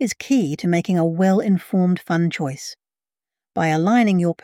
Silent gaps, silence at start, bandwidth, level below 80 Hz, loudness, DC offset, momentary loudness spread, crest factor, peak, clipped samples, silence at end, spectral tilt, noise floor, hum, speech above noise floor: none; 0 s; 15.5 kHz; -64 dBFS; -19 LUFS; under 0.1%; 10 LU; 14 dB; -6 dBFS; under 0.1%; 0.1 s; -6.5 dB/octave; under -90 dBFS; none; over 71 dB